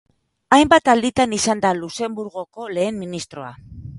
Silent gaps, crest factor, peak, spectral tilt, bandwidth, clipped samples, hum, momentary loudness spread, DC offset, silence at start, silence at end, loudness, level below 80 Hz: none; 20 dB; 0 dBFS; -4 dB/octave; 11.5 kHz; under 0.1%; none; 19 LU; under 0.1%; 0.5 s; 0 s; -18 LUFS; -48 dBFS